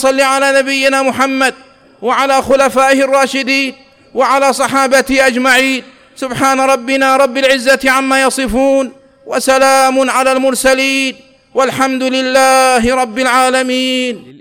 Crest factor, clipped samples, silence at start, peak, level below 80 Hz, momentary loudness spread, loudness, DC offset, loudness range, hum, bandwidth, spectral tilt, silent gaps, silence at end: 10 dB; under 0.1%; 0 s; -2 dBFS; -42 dBFS; 7 LU; -11 LUFS; under 0.1%; 1 LU; none; 19.5 kHz; -2 dB/octave; none; 0.1 s